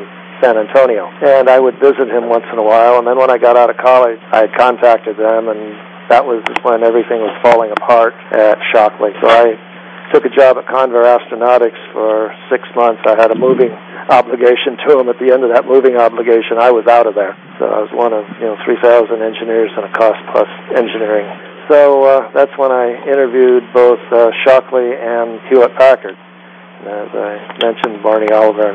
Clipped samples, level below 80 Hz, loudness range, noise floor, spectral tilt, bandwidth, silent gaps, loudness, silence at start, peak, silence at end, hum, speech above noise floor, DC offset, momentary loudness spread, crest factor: 0.4%; -64 dBFS; 3 LU; -37 dBFS; -6 dB/octave; 8 kHz; none; -11 LUFS; 0 s; 0 dBFS; 0 s; none; 27 dB; under 0.1%; 9 LU; 10 dB